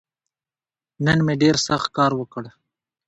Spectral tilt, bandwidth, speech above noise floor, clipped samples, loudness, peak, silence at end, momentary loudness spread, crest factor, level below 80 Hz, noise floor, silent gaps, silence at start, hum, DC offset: -5 dB/octave; 8.2 kHz; over 70 dB; under 0.1%; -20 LUFS; -4 dBFS; 0.6 s; 16 LU; 18 dB; -52 dBFS; under -90 dBFS; none; 1 s; none; under 0.1%